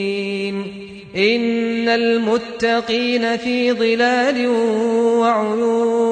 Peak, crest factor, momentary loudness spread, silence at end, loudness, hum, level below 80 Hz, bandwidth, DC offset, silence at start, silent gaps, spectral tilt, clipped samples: -4 dBFS; 14 dB; 7 LU; 0 s; -17 LUFS; none; -58 dBFS; 9.2 kHz; under 0.1%; 0 s; none; -5 dB/octave; under 0.1%